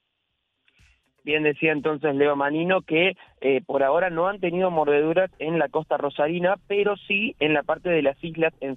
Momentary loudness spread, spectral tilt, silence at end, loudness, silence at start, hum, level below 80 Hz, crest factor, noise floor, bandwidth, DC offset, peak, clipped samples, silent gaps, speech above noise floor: 4 LU; -8.5 dB/octave; 0 s; -23 LUFS; 1.25 s; none; -60 dBFS; 16 dB; -76 dBFS; 4 kHz; under 0.1%; -8 dBFS; under 0.1%; none; 53 dB